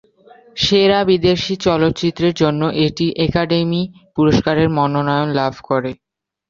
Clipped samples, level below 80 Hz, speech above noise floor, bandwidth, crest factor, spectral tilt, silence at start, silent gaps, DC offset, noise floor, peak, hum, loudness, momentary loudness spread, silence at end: under 0.1%; -42 dBFS; 31 dB; 7.6 kHz; 14 dB; -6 dB/octave; 0.55 s; none; under 0.1%; -47 dBFS; -2 dBFS; none; -16 LUFS; 7 LU; 0.55 s